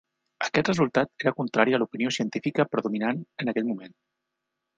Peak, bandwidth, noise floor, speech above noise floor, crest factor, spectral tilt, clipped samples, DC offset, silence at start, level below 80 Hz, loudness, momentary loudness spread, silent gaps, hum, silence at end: -4 dBFS; 9.6 kHz; -83 dBFS; 57 dB; 24 dB; -5.5 dB/octave; under 0.1%; under 0.1%; 0.4 s; -64 dBFS; -26 LUFS; 7 LU; none; none; 0.9 s